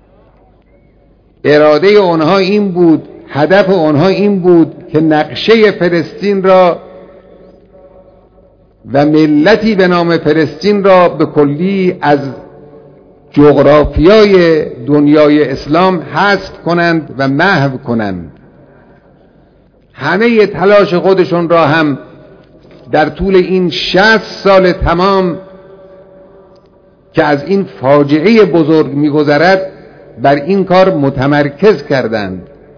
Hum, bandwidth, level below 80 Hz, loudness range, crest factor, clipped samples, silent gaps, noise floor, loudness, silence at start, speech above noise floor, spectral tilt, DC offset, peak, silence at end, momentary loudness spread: none; 5.4 kHz; -34 dBFS; 5 LU; 10 dB; 2%; none; -46 dBFS; -9 LUFS; 1.45 s; 37 dB; -7.5 dB/octave; under 0.1%; 0 dBFS; 0.3 s; 8 LU